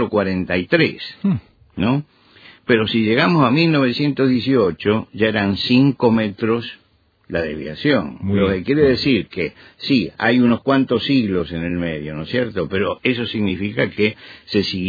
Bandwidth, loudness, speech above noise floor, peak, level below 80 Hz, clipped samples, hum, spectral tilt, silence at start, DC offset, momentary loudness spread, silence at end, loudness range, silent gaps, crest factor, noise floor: 5 kHz; -18 LUFS; 28 dB; -2 dBFS; -48 dBFS; under 0.1%; none; -8 dB/octave; 0 s; under 0.1%; 9 LU; 0 s; 3 LU; none; 16 dB; -46 dBFS